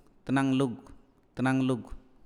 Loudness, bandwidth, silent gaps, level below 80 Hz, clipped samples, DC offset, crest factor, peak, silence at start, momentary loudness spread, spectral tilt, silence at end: -29 LUFS; 11 kHz; none; -54 dBFS; under 0.1%; under 0.1%; 16 dB; -14 dBFS; 0.25 s; 19 LU; -7 dB/octave; 0.25 s